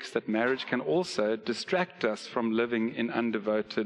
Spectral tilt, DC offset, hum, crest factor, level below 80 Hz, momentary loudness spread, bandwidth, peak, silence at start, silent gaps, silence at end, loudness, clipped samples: -5 dB/octave; under 0.1%; none; 18 dB; -74 dBFS; 3 LU; 11 kHz; -12 dBFS; 0 s; none; 0 s; -30 LUFS; under 0.1%